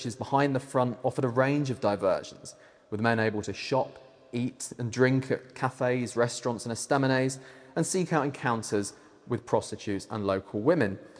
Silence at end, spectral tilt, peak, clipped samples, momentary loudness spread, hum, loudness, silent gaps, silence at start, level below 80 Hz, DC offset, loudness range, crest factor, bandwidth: 0 s; -5.5 dB/octave; -8 dBFS; under 0.1%; 10 LU; none; -29 LUFS; none; 0 s; -68 dBFS; under 0.1%; 2 LU; 20 dB; 10.5 kHz